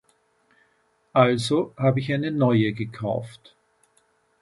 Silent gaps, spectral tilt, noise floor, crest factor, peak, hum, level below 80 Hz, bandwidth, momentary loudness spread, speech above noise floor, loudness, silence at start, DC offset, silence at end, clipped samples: none; -7 dB/octave; -66 dBFS; 22 dB; -2 dBFS; none; -62 dBFS; 11.5 kHz; 10 LU; 44 dB; -23 LUFS; 1.15 s; under 0.1%; 1.1 s; under 0.1%